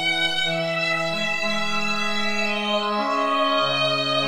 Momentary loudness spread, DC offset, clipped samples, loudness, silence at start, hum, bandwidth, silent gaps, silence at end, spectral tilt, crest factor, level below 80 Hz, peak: 3 LU; under 0.1%; under 0.1%; -22 LUFS; 0 s; none; 18 kHz; none; 0 s; -3.5 dB/octave; 14 dB; -60 dBFS; -10 dBFS